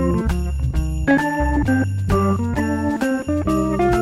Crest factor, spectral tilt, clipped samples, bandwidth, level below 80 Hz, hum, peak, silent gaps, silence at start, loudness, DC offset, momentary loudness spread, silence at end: 14 dB; -7.5 dB/octave; under 0.1%; 14 kHz; -26 dBFS; none; -6 dBFS; none; 0 s; -20 LUFS; under 0.1%; 5 LU; 0 s